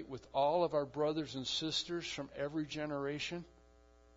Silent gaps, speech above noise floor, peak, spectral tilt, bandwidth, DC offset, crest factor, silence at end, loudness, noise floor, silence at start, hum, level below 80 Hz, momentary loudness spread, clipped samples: none; 27 dB; -20 dBFS; -3 dB/octave; 7.4 kHz; under 0.1%; 18 dB; 0.7 s; -37 LUFS; -64 dBFS; 0 s; none; -66 dBFS; 8 LU; under 0.1%